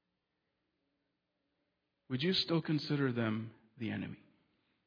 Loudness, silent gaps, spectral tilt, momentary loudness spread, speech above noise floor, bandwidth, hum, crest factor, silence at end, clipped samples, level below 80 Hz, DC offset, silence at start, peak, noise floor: -36 LUFS; none; -4.5 dB/octave; 14 LU; 50 dB; 5.4 kHz; 60 Hz at -65 dBFS; 18 dB; 0.7 s; under 0.1%; -78 dBFS; under 0.1%; 2.1 s; -20 dBFS; -85 dBFS